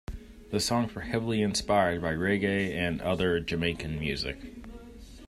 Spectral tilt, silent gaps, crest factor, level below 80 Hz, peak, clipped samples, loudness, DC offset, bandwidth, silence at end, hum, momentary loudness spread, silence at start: -5 dB/octave; none; 18 dB; -48 dBFS; -12 dBFS; under 0.1%; -29 LUFS; under 0.1%; 15 kHz; 0 s; none; 19 LU; 0.1 s